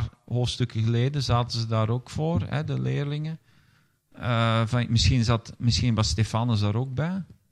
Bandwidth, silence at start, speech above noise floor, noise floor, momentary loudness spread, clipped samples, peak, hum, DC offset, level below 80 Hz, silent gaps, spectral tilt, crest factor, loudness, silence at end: 10 kHz; 0 s; 39 dB; -63 dBFS; 8 LU; under 0.1%; -8 dBFS; none; under 0.1%; -44 dBFS; none; -6 dB/octave; 18 dB; -26 LUFS; 0.25 s